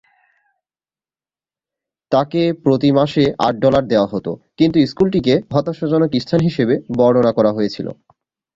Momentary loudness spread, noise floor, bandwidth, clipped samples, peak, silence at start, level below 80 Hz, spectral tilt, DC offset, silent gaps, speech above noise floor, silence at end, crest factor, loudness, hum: 7 LU; under -90 dBFS; 7.6 kHz; under 0.1%; -2 dBFS; 2.1 s; -50 dBFS; -8 dB/octave; under 0.1%; none; over 75 dB; 0.65 s; 16 dB; -16 LUFS; none